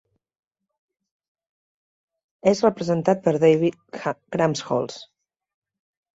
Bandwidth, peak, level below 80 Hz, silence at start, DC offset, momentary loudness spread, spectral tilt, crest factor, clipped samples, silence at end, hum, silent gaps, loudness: 8 kHz; -4 dBFS; -64 dBFS; 2.45 s; under 0.1%; 12 LU; -6 dB/octave; 20 dB; under 0.1%; 1.1 s; none; none; -22 LUFS